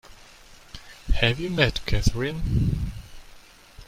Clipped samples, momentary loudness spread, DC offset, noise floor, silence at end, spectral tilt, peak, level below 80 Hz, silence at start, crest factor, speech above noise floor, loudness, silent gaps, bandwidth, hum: under 0.1%; 21 LU; under 0.1%; -49 dBFS; 0.05 s; -5.5 dB/octave; -2 dBFS; -32 dBFS; 0.1 s; 22 dB; 26 dB; -25 LUFS; none; 16 kHz; none